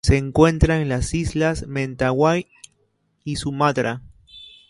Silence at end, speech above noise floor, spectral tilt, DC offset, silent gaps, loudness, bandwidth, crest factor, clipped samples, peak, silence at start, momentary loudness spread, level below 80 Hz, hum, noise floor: 0.25 s; 47 dB; -6 dB/octave; under 0.1%; none; -20 LUFS; 11.5 kHz; 20 dB; under 0.1%; -2 dBFS; 0.05 s; 15 LU; -32 dBFS; none; -67 dBFS